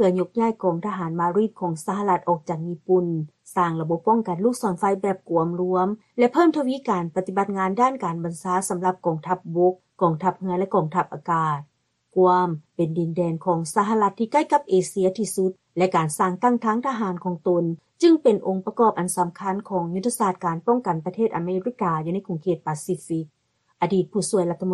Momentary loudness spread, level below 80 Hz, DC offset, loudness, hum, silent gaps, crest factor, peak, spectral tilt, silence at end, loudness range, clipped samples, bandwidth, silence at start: 7 LU; -66 dBFS; under 0.1%; -23 LUFS; none; none; 16 dB; -6 dBFS; -6.5 dB/octave; 0 s; 3 LU; under 0.1%; 12 kHz; 0 s